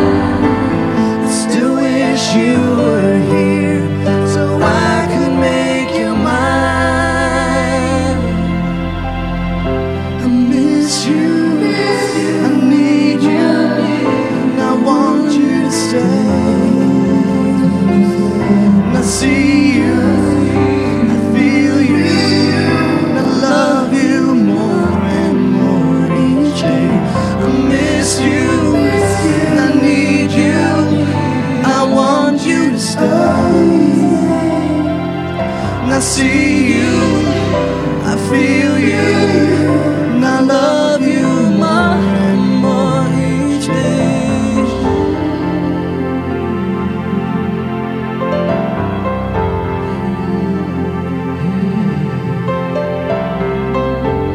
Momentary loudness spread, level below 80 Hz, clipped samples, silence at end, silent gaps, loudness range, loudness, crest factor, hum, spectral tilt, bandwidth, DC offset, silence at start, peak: 6 LU; -34 dBFS; under 0.1%; 0 s; none; 5 LU; -13 LUFS; 12 dB; none; -6 dB/octave; 13 kHz; under 0.1%; 0 s; 0 dBFS